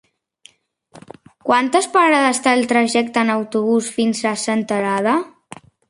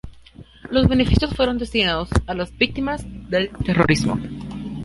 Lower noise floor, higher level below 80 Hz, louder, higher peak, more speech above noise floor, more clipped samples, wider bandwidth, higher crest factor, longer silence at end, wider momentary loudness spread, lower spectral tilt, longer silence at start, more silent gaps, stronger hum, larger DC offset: first, -51 dBFS vs -44 dBFS; second, -66 dBFS vs -32 dBFS; first, -17 LUFS vs -20 LUFS; about the same, -2 dBFS vs -2 dBFS; first, 35 dB vs 24 dB; neither; about the same, 11.5 kHz vs 11.5 kHz; about the same, 16 dB vs 18 dB; first, 0.6 s vs 0 s; second, 6 LU vs 11 LU; second, -3.5 dB/octave vs -6 dB/octave; first, 0.95 s vs 0.05 s; neither; neither; neither